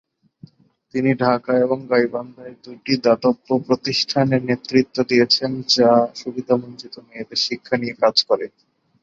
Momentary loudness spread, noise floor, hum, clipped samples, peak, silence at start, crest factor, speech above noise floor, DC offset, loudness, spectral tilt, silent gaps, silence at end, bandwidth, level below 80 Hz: 18 LU; -47 dBFS; none; under 0.1%; -2 dBFS; 0.95 s; 18 dB; 28 dB; under 0.1%; -19 LUFS; -5 dB/octave; none; 0.55 s; 7.6 kHz; -62 dBFS